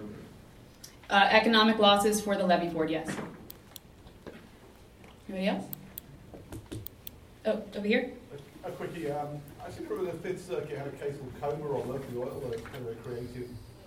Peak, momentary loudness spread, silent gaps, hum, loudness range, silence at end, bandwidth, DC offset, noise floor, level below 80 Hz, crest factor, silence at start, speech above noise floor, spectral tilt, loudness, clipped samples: -8 dBFS; 26 LU; none; none; 14 LU; 0 s; 16 kHz; under 0.1%; -54 dBFS; -58 dBFS; 24 dB; 0 s; 24 dB; -4.5 dB/octave; -30 LUFS; under 0.1%